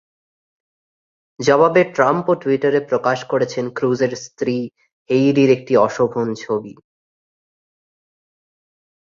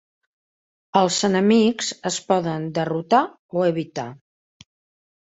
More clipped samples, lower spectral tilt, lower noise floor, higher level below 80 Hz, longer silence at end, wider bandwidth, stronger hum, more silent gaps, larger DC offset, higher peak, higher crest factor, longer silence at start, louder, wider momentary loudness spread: neither; first, -6 dB/octave vs -4.5 dB/octave; about the same, under -90 dBFS vs under -90 dBFS; about the same, -62 dBFS vs -66 dBFS; first, 2.35 s vs 1.05 s; about the same, 7.6 kHz vs 8.2 kHz; neither; about the same, 4.92-5.05 s vs 3.39-3.49 s; neither; about the same, -2 dBFS vs -2 dBFS; about the same, 18 dB vs 20 dB; first, 1.4 s vs 0.95 s; first, -18 LUFS vs -21 LUFS; about the same, 10 LU vs 10 LU